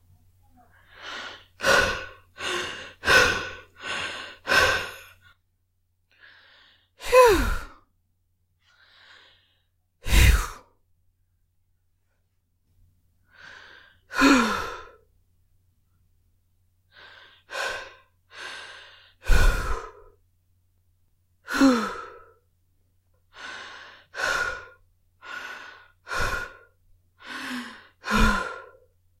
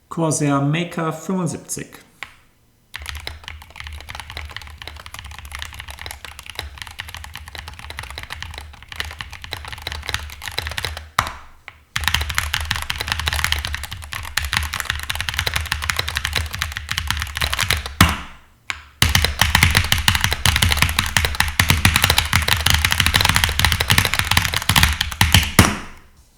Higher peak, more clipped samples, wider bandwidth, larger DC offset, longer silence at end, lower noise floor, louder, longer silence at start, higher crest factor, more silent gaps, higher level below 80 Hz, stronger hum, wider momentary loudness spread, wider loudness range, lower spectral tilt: second, -4 dBFS vs 0 dBFS; neither; second, 16 kHz vs over 20 kHz; neither; first, 0.55 s vs 0.4 s; first, -71 dBFS vs -56 dBFS; second, -24 LUFS vs -18 LUFS; first, 1 s vs 0.1 s; about the same, 24 dB vs 22 dB; neither; about the same, -34 dBFS vs -32 dBFS; neither; first, 23 LU vs 19 LU; second, 11 LU vs 17 LU; about the same, -4 dB/octave vs -3 dB/octave